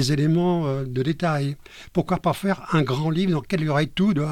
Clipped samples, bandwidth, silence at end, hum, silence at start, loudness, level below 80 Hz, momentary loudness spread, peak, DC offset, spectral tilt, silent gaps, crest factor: under 0.1%; 15.5 kHz; 0 s; none; 0 s; -23 LUFS; -48 dBFS; 6 LU; -8 dBFS; under 0.1%; -6.5 dB/octave; none; 14 dB